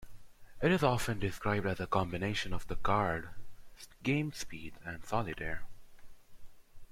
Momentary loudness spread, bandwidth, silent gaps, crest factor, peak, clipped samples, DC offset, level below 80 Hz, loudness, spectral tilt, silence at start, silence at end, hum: 15 LU; 16 kHz; none; 20 dB; -14 dBFS; under 0.1%; under 0.1%; -50 dBFS; -35 LUFS; -5.5 dB/octave; 0 s; 0.05 s; none